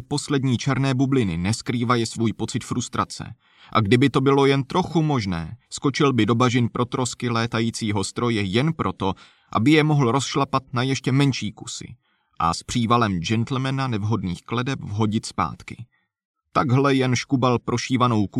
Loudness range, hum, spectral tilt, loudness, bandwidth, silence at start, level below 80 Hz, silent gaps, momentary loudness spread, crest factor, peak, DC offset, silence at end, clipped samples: 3 LU; none; -5.5 dB/octave; -22 LUFS; 12 kHz; 0 s; -52 dBFS; 16.25-16.34 s; 10 LU; 18 dB; -4 dBFS; under 0.1%; 0 s; under 0.1%